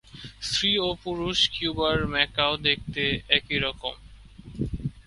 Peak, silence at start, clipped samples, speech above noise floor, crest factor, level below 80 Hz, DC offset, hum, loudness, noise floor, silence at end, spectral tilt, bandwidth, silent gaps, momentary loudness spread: -2 dBFS; 0.15 s; under 0.1%; 20 dB; 24 dB; -44 dBFS; under 0.1%; none; -25 LUFS; -46 dBFS; 0.05 s; -3.5 dB/octave; 11.5 kHz; none; 12 LU